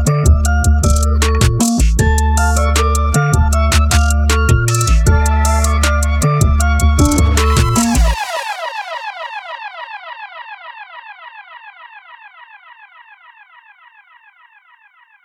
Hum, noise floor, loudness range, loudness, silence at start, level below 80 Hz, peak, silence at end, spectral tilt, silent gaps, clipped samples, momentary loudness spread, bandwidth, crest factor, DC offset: none; -49 dBFS; 18 LU; -14 LUFS; 0 s; -16 dBFS; 0 dBFS; 2.8 s; -5 dB/octave; none; under 0.1%; 19 LU; 15.5 kHz; 14 dB; under 0.1%